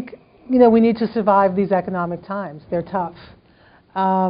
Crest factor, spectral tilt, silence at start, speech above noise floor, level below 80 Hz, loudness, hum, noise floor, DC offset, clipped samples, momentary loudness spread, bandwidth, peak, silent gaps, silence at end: 18 dB; -7 dB/octave; 0 s; 34 dB; -54 dBFS; -18 LUFS; none; -52 dBFS; under 0.1%; under 0.1%; 15 LU; 5.2 kHz; -2 dBFS; none; 0 s